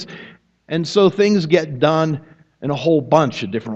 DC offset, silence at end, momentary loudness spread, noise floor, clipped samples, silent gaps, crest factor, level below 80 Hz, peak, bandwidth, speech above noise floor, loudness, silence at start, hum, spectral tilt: under 0.1%; 0 s; 14 LU; -43 dBFS; under 0.1%; none; 18 dB; -56 dBFS; 0 dBFS; 8.2 kHz; 27 dB; -17 LUFS; 0 s; none; -6.5 dB/octave